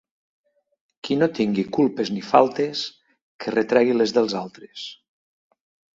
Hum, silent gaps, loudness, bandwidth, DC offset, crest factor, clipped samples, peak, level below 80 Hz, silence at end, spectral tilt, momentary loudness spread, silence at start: none; 3.22-3.39 s; -21 LUFS; 7.8 kHz; under 0.1%; 24 dB; under 0.1%; 0 dBFS; -64 dBFS; 1.05 s; -5.5 dB/octave; 17 LU; 1.05 s